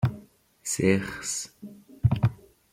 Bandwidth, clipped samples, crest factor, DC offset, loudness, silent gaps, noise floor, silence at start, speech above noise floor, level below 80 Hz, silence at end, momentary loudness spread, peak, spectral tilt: 16 kHz; under 0.1%; 22 dB; under 0.1%; -27 LUFS; none; -52 dBFS; 0 s; 25 dB; -48 dBFS; 0.4 s; 22 LU; -8 dBFS; -5.5 dB/octave